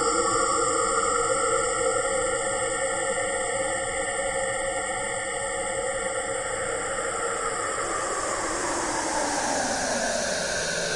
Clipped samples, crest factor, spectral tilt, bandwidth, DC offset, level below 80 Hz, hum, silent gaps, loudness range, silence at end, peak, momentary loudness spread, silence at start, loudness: under 0.1%; 16 dB; -1.5 dB/octave; 11.5 kHz; under 0.1%; -48 dBFS; none; none; 3 LU; 0 s; -10 dBFS; 5 LU; 0 s; -26 LUFS